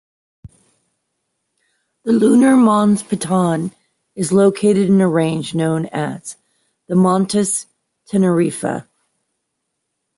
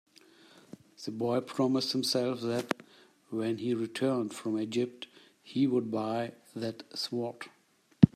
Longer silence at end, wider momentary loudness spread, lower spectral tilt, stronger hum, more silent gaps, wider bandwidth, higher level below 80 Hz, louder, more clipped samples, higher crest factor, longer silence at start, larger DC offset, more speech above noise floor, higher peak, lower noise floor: first, 1.35 s vs 0.1 s; about the same, 13 LU vs 15 LU; about the same, -6 dB/octave vs -6 dB/octave; neither; neither; second, 11.5 kHz vs 14.5 kHz; first, -58 dBFS vs -68 dBFS; first, -16 LUFS vs -32 LUFS; neither; second, 14 dB vs 28 dB; second, 0.45 s vs 1 s; neither; first, 60 dB vs 27 dB; about the same, -2 dBFS vs -4 dBFS; first, -74 dBFS vs -59 dBFS